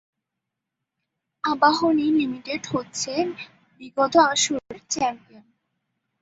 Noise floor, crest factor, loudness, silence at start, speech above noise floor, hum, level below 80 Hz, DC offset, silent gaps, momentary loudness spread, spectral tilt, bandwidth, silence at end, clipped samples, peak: -84 dBFS; 22 dB; -22 LUFS; 1.45 s; 61 dB; none; -64 dBFS; under 0.1%; none; 13 LU; -2.5 dB/octave; 8 kHz; 1.05 s; under 0.1%; -2 dBFS